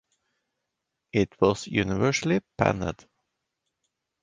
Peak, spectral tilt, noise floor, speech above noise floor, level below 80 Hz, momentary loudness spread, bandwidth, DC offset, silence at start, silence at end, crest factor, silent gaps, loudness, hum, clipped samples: -4 dBFS; -5.5 dB/octave; -83 dBFS; 58 dB; -52 dBFS; 8 LU; 10 kHz; under 0.1%; 1.15 s; 1.3 s; 24 dB; none; -26 LUFS; none; under 0.1%